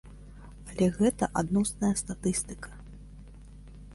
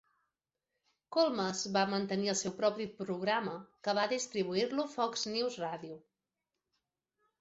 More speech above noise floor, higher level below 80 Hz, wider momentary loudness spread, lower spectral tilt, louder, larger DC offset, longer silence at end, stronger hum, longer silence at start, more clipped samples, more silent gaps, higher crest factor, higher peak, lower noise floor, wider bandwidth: second, 20 dB vs 55 dB; first, -48 dBFS vs -78 dBFS; first, 24 LU vs 9 LU; first, -5.5 dB/octave vs -3 dB/octave; first, -29 LUFS vs -34 LUFS; neither; second, 0 s vs 1.45 s; first, 50 Hz at -45 dBFS vs none; second, 0.05 s vs 1.1 s; neither; neither; about the same, 18 dB vs 20 dB; first, -12 dBFS vs -16 dBFS; second, -48 dBFS vs -89 dBFS; first, 11.5 kHz vs 8 kHz